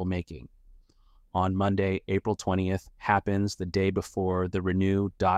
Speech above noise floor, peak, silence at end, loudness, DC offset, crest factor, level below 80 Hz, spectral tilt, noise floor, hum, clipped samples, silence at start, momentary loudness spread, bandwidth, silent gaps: 33 dB; -8 dBFS; 0 s; -28 LUFS; under 0.1%; 20 dB; -52 dBFS; -7 dB/octave; -60 dBFS; none; under 0.1%; 0 s; 6 LU; 12 kHz; none